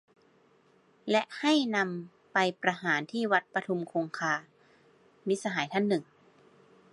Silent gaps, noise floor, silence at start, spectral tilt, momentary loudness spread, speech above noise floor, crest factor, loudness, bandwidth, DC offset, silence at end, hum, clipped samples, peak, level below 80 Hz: none; -64 dBFS; 1.05 s; -4.5 dB/octave; 7 LU; 35 dB; 22 dB; -30 LUFS; 11.5 kHz; under 0.1%; 0.9 s; none; under 0.1%; -10 dBFS; -82 dBFS